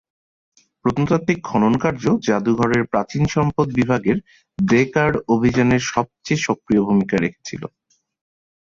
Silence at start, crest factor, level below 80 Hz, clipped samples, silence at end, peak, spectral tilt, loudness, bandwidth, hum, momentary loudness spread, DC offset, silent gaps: 0.85 s; 16 dB; -48 dBFS; under 0.1%; 1.05 s; -4 dBFS; -6.5 dB/octave; -19 LUFS; 7.6 kHz; none; 8 LU; under 0.1%; none